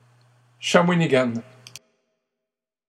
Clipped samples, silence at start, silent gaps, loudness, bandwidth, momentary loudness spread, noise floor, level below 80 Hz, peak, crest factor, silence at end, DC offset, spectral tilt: under 0.1%; 0.6 s; none; -20 LUFS; 11.5 kHz; 16 LU; -86 dBFS; -78 dBFS; 0 dBFS; 24 dB; 1.1 s; under 0.1%; -5.5 dB/octave